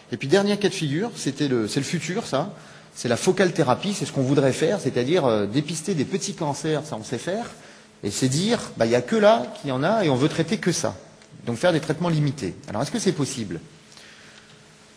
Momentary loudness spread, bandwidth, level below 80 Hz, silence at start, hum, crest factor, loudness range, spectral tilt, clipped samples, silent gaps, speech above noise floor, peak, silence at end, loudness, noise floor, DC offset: 11 LU; 11 kHz; -60 dBFS; 0.1 s; none; 20 dB; 4 LU; -5 dB/octave; under 0.1%; none; 27 dB; -4 dBFS; 0.6 s; -23 LUFS; -50 dBFS; under 0.1%